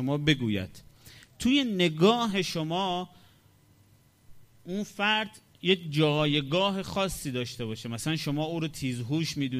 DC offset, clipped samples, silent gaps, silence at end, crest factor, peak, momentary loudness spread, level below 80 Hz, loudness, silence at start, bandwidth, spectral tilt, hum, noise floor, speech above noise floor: under 0.1%; under 0.1%; none; 0 s; 22 dB; -8 dBFS; 11 LU; -56 dBFS; -28 LUFS; 0 s; 15.5 kHz; -5 dB/octave; none; -61 dBFS; 33 dB